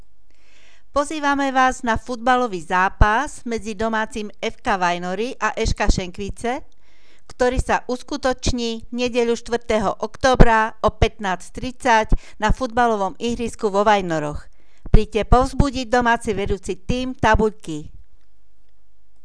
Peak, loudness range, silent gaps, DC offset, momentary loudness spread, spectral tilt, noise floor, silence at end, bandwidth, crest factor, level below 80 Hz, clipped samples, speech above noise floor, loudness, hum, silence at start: 0 dBFS; 4 LU; none; 2%; 10 LU; -5 dB/octave; -61 dBFS; 1.25 s; 11 kHz; 20 dB; -26 dBFS; under 0.1%; 42 dB; -21 LUFS; none; 0.95 s